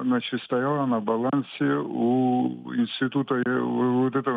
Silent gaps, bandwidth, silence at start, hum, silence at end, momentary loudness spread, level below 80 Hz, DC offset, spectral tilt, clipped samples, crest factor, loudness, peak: none; 4.8 kHz; 0 s; none; 0 s; 4 LU; -76 dBFS; under 0.1%; -9 dB/octave; under 0.1%; 12 dB; -25 LUFS; -12 dBFS